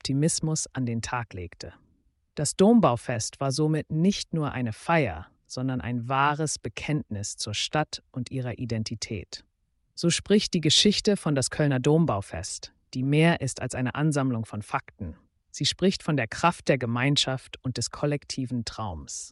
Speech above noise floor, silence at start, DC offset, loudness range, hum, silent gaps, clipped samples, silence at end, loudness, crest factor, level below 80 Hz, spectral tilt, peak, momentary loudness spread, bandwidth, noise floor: 41 dB; 0.05 s; under 0.1%; 5 LU; none; none; under 0.1%; 0 s; -26 LUFS; 18 dB; -54 dBFS; -4.5 dB/octave; -8 dBFS; 14 LU; 11.5 kHz; -68 dBFS